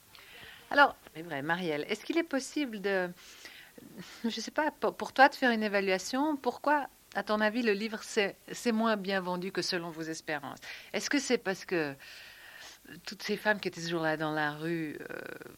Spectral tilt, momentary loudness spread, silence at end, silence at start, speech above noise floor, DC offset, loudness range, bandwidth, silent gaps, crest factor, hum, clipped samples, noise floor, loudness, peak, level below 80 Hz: -4 dB/octave; 20 LU; 0 s; 0.15 s; 20 dB; under 0.1%; 6 LU; 17 kHz; none; 24 dB; none; under 0.1%; -52 dBFS; -31 LUFS; -8 dBFS; -72 dBFS